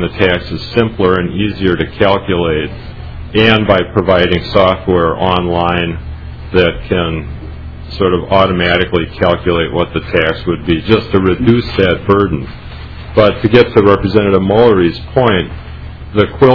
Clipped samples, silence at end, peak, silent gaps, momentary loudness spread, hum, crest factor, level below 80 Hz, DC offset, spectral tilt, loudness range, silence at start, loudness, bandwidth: 0.8%; 0 s; 0 dBFS; none; 17 LU; none; 12 dB; -30 dBFS; 0.7%; -8.5 dB/octave; 4 LU; 0 s; -12 LUFS; 5.4 kHz